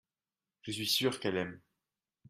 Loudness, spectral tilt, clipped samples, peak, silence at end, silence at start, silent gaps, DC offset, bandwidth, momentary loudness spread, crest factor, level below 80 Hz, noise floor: -33 LUFS; -3.5 dB/octave; under 0.1%; -18 dBFS; 0.7 s; 0.65 s; none; under 0.1%; 15.5 kHz; 12 LU; 20 dB; -74 dBFS; under -90 dBFS